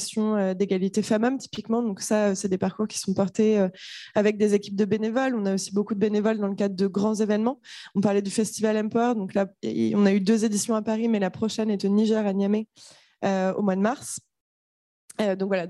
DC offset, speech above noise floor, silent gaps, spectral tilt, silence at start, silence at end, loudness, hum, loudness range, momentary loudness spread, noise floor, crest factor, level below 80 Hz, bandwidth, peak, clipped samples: under 0.1%; over 66 dB; 14.41-15.08 s; -5.5 dB/octave; 0 s; 0 s; -25 LUFS; none; 2 LU; 7 LU; under -90 dBFS; 16 dB; -70 dBFS; 12.5 kHz; -8 dBFS; under 0.1%